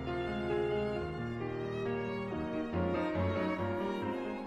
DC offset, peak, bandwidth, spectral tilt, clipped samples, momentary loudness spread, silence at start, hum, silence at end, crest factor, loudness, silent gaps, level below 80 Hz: under 0.1%; -22 dBFS; 11.5 kHz; -8 dB/octave; under 0.1%; 4 LU; 0 s; none; 0 s; 14 dB; -36 LUFS; none; -54 dBFS